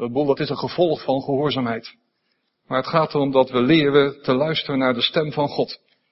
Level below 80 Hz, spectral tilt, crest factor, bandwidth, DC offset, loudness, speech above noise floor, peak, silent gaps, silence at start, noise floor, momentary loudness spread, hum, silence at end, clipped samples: -58 dBFS; -9.5 dB/octave; 20 dB; 6 kHz; under 0.1%; -20 LUFS; 51 dB; -2 dBFS; none; 0 s; -71 dBFS; 9 LU; none; 0.35 s; under 0.1%